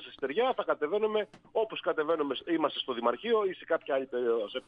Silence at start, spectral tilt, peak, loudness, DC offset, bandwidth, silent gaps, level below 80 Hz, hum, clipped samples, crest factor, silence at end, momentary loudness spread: 0 s; -6.5 dB/octave; -14 dBFS; -31 LUFS; under 0.1%; 5 kHz; none; -74 dBFS; none; under 0.1%; 16 dB; 0.05 s; 4 LU